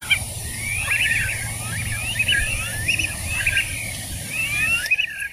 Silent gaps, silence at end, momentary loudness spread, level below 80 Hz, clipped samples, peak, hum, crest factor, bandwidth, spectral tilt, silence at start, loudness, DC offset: none; 0 s; 8 LU; -36 dBFS; under 0.1%; -6 dBFS; none; 18 dB; 16 kHz; -1.5 dB/octave; 0 s; -21 LUFS; under 0.1%